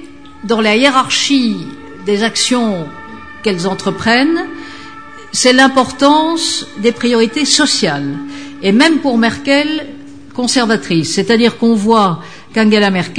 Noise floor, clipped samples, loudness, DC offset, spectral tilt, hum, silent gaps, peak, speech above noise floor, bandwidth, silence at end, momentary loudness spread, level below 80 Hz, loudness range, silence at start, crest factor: -33 dBFS; under 0.1%; -12 LUFS; 1%; -3.5 dB/octave; none; none; 0 dBFS; 21 dB; 10 kHz; 0 s; 16 LU; -50 dBFS; 4 LU; 0 s; 14 dB